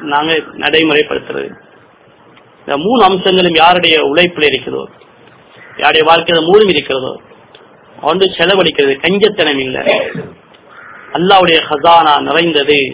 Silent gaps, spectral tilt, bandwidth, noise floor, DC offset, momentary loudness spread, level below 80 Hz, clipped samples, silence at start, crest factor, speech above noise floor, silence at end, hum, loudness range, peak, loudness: none; -8.5 dB/octave; 4 kHz; -44 dBFS; under 0.1%; 14 LU; -48 dBFS; 1%; 0 s; 12 dB; 33 dB; 0 s; none; 2 LU; 0 dBFS; -10 LUFS